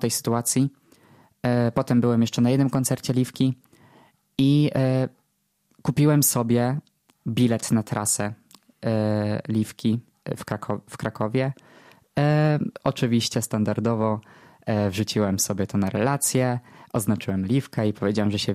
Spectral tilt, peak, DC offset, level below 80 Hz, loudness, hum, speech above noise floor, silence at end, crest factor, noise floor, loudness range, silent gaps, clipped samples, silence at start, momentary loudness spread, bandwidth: -5.5 dB/octave; -6 dBFS; under 0.1%; -58 dBFS; -24 LUFS; none; 49 dB; 0 s; 16 dB; -71 dBFS; 4 LU; none; under 0.1%; 0 s; 11 LU; 15.5 kHz